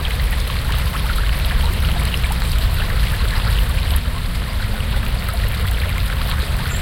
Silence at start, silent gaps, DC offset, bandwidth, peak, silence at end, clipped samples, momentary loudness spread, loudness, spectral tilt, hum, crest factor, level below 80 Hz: 0 s; none; under 0.1%; 17 kHz; -2 dBFS; 0 s; under 0.1%; 3 LU; -20 LUFS; -4.5 dB/octave; none; 16 dB; -18 dBFS